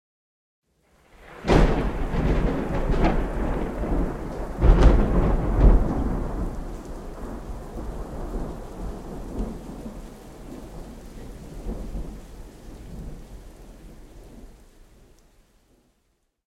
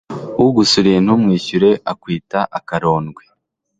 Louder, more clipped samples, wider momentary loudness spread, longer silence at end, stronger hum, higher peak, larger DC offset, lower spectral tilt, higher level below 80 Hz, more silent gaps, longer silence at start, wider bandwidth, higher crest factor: second, -26 LUFS vs -15 LUFS; neither; first, 25 LU vs 11 LU; first, 1.95 s vs 0.65 s; neither; about the same, -4 dBFS vs -2 dBFS; neither; first, -7.5 dB/octave vs -5.5 dB/octave; first, -26 dBFS vs -50 dBFS; neither; first, 1.2 s vs 0.1 s; about the same, 9.8 kHz vs 9.2 kHz; first, 22 dB vs 14 dB